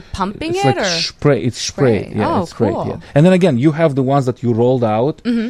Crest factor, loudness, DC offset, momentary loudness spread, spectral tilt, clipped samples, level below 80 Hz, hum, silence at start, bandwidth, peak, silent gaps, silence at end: 14 dB; -15 LUFS; under 0.1%; 6 LU; -6 dB/octave; under 0.1%; -42 dBFS; none; 0.15 s; 12 kHz; 0 dBFS; none; 0 s